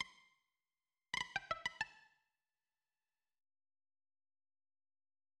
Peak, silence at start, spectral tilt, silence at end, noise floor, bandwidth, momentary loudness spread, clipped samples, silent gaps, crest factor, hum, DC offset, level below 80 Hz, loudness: -24 dBFS; 0 s; -1 dB/octave; 3.4 s; under -90 dBFS; 10.5 kHz; 5 LU; under 0.1%; none; 28 dB; none; under 0.1%; -78 dBFS; -44 LUFS